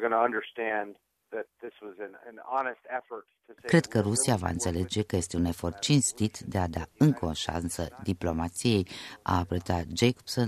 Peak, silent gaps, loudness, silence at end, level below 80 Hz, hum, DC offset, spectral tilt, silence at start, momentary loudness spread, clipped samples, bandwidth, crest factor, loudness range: -8 dBFS; none; -29 LUFS; 0 s; -50 dBFS; none; under 0.1%; -5 dB/octave; 0 s; 17 LU; under 0.1%; 14 kHz; 20 dB; 5 LU